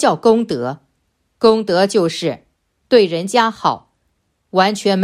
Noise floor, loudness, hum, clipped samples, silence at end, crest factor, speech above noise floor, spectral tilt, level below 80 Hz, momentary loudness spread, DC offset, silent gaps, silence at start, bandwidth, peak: -66 dBFS; -16 LUFS; none; under 0.1%; 0 s; 16 dB; 52 dB; -5 dB/octave; -58 dBFS; 11 LU; under 0.1%; none; 0 s; 14 kHz; 0 dBFS